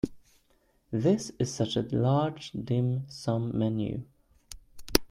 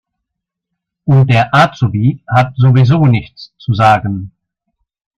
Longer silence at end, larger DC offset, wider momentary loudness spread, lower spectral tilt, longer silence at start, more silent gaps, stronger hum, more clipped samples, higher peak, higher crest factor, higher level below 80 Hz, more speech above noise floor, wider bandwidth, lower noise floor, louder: second, 0.05 s vs 0.9 s; neither; about the same, 13 LU vs 12 LU; second, -6 dB/octave vs -8 dB/octave; second, 0.05 s vs 1.05 s; neither; neither; neither; about the same, -2 dBFS vs 0 dBFS; first, 28 dB vs 12 dB; second, -50 dBFS vs -44 dBFS; second, 39 dB vs 67 dB; first, 16.5 kHz vs 7.4 kHz; second, -68 dBFS vs -78 dBFS; second, -30 LUFS vs -11 LUFS